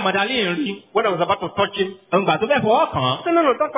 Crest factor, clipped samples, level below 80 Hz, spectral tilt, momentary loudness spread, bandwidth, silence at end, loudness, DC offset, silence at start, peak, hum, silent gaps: 14 dB; under 0.1%; -54 dBFS; -9 dB/octave; 5 LU; 4 kHz; 0 s; -19 LUFS; under 0.1%; 0 s; -4 dBFS; none; none